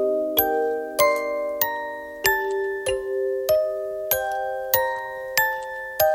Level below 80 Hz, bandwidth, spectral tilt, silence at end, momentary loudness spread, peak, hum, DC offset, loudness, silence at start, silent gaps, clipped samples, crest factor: -54 dBFS; 17 kHz; -2 dB/octave; 0 s; 7 LU; -4 dBFS; none; under 0.1%; -23 LUFS; 0 s; none; under 0.1%; 20 dB